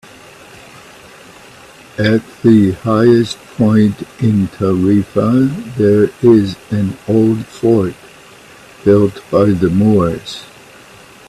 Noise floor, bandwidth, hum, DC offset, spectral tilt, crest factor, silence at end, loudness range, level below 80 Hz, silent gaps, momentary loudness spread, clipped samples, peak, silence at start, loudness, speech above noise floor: -39 dBFS; 13 kHz; none; under 0.1%; -8 dB/octave; 14 dB; 0.85 s; 2 LU; -46 dBFS; none; 8 LU; under 0.1%; 0 dBFS; 2 s; -13 LUFS; 27 dB